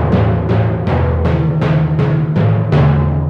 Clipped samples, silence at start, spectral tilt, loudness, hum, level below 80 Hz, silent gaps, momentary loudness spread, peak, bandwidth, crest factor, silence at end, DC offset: under 0.1%; 0 s; -10 dB/octave; -14 LUFS; none; -28 dBFS; none; 3 LU; -2 dBFS; 5.6 kHz; 10 dB; 0 s; under 0.1%